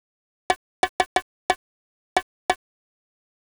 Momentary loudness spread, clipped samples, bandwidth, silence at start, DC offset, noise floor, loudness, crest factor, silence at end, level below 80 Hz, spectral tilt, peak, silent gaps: 3 LU; under 0.1%; over 20 kHz; 0.5 s; under 0.1%; under -90 dBFS; -27 LUFS; 22 dB; 0.95 s; -56 dBFS; -1.5 dB/octave; -8 dBFS; 0.56-0.83 s, 0.89-0.99 s, 1.06-1.16 s, 1.22-1.49 s, 1.56-2.16 s, 2.23-2.49 s